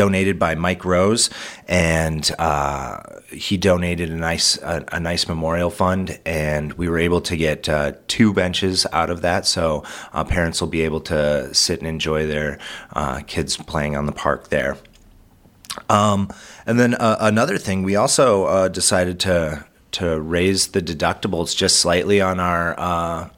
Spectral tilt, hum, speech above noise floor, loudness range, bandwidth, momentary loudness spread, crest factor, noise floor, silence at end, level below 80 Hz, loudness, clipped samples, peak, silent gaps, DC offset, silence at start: -4 dB/octave; none; 31 dB; 5 LU; 17 kHz; 9 LU; 20 dB; -50 dBFS; 0.1 s; -38 dBFS; -19 LUFS; under 0.1%; 0 dBFS; none; under 0.1%; 0 s